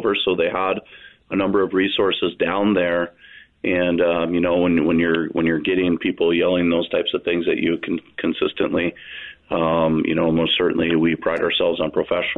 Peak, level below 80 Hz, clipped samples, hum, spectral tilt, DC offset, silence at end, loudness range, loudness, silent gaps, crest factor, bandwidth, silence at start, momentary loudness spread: -8 dBFS; -52 dBFS; under 0.1%; none; -8.5 dB/octave; under 0.1%; 0 s; 2 LU; -20 LUFS; none; 12 dB; 4.1 kHz; 0 s; 7 LU